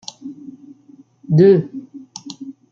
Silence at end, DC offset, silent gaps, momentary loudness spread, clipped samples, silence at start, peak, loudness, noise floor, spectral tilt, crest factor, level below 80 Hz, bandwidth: 0.2 s; under 0.1%; none; 24 LU; under 0.1%; 0.25 s; -2 dBFS; -14 LUFS; -48 dBFS; -8 dB/octave; 18 dB; -64 dBFS; 7.4 kHz